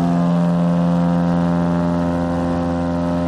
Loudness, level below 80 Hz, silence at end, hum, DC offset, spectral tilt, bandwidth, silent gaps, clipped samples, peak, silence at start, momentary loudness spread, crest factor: -18 LUFS; -40 dBFS; 0 s; none; under 0.1%; -9 dB/octave; 7 kHz; none; under 0.1%; -6 dBFS; 0 s; 3 LU; 12 dB